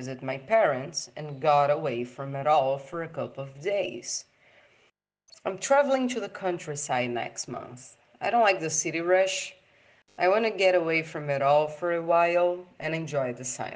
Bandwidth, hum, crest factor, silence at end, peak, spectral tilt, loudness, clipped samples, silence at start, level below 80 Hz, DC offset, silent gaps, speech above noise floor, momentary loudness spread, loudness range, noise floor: 10 kHz; none; 18 dB; 0 s; -10 dBFS; -4 dB/octave; -27 LUFS; under 0.1%; 0 s; -74 dBFS; under 0.1%; none; 41 dB; 12 LU; 5 LU; -68 dBFS